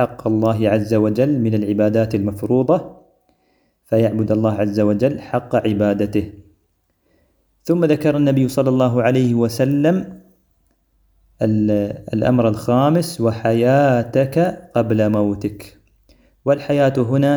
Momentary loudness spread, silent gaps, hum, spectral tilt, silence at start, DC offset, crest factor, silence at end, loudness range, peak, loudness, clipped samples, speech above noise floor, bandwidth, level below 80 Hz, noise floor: 6 LU; none; none; -8 dB/octave; 0 s; under 0.1%; 16 dB; 0 s; 3 LU; -2 dBFS; -18 LUFS; under 0.1%; 49 dB; over 20 kHz; -50 dBFS; -65 dBFS